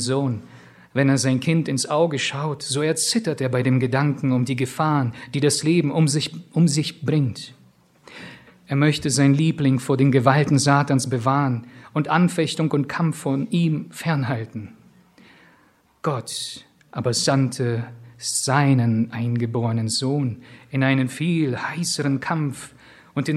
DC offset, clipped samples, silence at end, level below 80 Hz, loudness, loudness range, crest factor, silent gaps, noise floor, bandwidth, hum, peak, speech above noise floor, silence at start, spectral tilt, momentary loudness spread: under 0.1%; under 0.1%; 0 s; -62 dBFS; -21 LUFS; 6 LU; 22 dB; none; -58 dBFS; 14 kHz; none; 0 dBFS; 37 dB; 0 s; -5.5 dB/octave; 11 LU